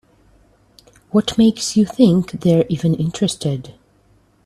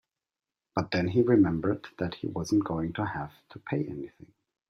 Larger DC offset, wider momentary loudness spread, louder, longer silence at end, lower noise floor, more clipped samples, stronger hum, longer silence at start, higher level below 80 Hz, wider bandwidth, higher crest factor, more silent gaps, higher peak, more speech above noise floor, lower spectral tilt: neither; second, 7 LU vs 16 LU; first, -17 LUFS vs -29 LUFS; first, 0.75 s vs 0.6 s; second, -55 dBFS vs under -90 dBFS; neither; neither; first, 1.15 s vs 0.75 s; first, -50 dBFS vs -58 dBFS; first, 13.5 kHz vs 10.5 kHz; about the same, 18 dB vs 20 dB; neither; first, 0 dBFS vs -10 dBFS; second, 39 dB vs over 62 dB; about the same, -6.5 dB/octave vs -7 dB/octave